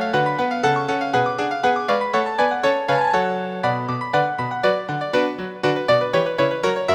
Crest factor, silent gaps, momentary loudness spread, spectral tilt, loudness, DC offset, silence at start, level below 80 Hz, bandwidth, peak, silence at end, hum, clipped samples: 16 dB; none; 5 LU; -5.5 dB/octave; -20 LUFS; under 0.1%; 0 s; -58 dBFS; 19 kHz; -4 dBFS; 0 s; none; under 0.1%